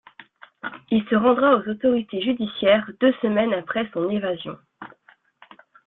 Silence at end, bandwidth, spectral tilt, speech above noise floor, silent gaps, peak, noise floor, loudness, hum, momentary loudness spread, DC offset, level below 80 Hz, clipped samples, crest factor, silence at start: 1 s; 4.1 kHz; -9.5 dB/octave; 35 dB; none; -6 dBFS; -56 dBFS; -21 LUFS; none; 18 LU; under 0.1%; -62 dBFS; under 0.1%; 18 dB; 0.65 s